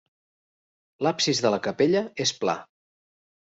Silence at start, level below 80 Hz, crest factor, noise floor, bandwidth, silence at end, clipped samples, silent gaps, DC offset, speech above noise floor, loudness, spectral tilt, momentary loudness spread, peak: 1 s; -68 dBFS; 18 dB; under -90 dBFS; 8 kHz; 0.85 s; under 0.1%; none; under 0.1%; over 66 dB; -25 LUFS; -3.5 dB/octave; 6 LU; -8 dBFS